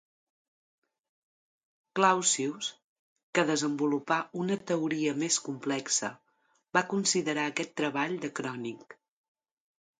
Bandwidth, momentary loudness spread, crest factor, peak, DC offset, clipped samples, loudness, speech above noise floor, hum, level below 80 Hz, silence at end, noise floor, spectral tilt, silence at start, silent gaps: 9.6 kHz; 11 LU; 22 dB; -10 dBFS; under 0.1%; under 0.1%; -30 LUFS; 42 dB; none; -80 dBFS; 1.05 s; -72 dBFS; -3 dB/octave; 1.95 s; 2.84-3.16 s, 3.23-3.33 s